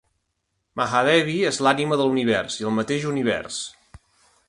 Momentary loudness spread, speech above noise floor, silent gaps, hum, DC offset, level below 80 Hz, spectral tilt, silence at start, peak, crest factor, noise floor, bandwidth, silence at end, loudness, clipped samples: 12 LU; 54 dB; none; none; under 0.1%; -58 dBFS; -4.5 dB/octave; 0.75 s; -2 dBFS; 20 dB; -75 dBFS; 11.5 kHz; 0.5 s; -22 LUFS; under 0.1%